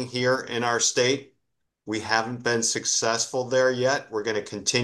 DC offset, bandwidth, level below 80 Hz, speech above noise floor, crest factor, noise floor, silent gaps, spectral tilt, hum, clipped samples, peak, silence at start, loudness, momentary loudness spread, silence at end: under 0.1%; 12.5 kHz; -70 dBFS; 53 dB; 20 dB; -78 dBFS; none; -2.5 dB/octave; none; under 0.1%; -6 dBFS; 0 s; -24 LUFS; 7 LU; 0 s